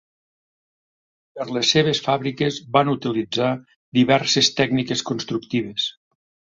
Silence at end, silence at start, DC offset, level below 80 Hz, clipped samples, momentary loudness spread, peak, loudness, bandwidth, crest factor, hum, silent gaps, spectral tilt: 0.65 s; 1.35 s; under 0.1%; -60 dBFS; under 0.1%; 9 LU; -2 dBFS; -20 LUFS; 7.8 kHz; 20 dB; none; 3.76-3.92 s; -4 dB/octave